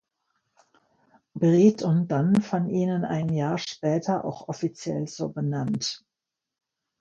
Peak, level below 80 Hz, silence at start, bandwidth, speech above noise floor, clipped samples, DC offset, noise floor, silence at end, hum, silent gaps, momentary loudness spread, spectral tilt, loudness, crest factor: -6 dBFS; -66 dBFS; 1.35 s; 8.4 kHz; 62 dB; under 0.1%; under 0.1%; -87 dBFS; 1.05 s; none; none; 12 LU; -7 dB/octave; -25 LUFS; 20 dB